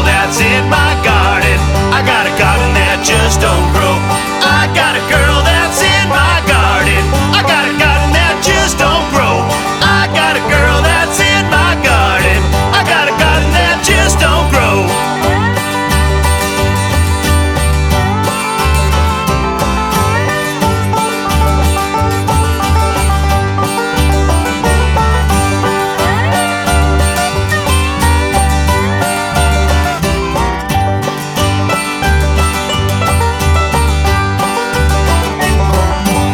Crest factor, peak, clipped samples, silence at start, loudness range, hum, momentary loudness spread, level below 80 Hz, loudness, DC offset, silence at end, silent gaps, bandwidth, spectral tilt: 10 dB; 0 dBFS; under 0.1%; 0 s; 3 LU; none; 4 LU; -16 dBFS; -11 LUFS; under 0.1%; 0 s; none; 18 kHz; -4.5 dB/octave